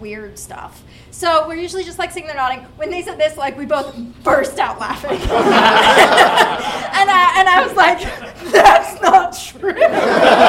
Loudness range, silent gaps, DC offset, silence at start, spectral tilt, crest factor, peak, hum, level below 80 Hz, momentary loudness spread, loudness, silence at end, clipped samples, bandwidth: 9 LU; none; under 0.1%; 0 s; -3 dB/octave; 14 dB; 0 dBFS; none; -40 dBFS; 16 LU; -13 LUFS; 0 s; under 0.1%; 16.5 kHz